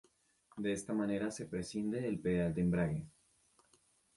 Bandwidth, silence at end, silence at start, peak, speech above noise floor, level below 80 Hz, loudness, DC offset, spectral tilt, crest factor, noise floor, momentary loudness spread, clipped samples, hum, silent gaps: 11.5 kHz; 1.1 s; 0.55 s; -22 dBFS; 36 dB; -60 dBFS; -37 LUFS; under 0.1%; -6.5 dB/octave; 16 dB; -72 dBFS; 9 LU; under 0.1%; none; none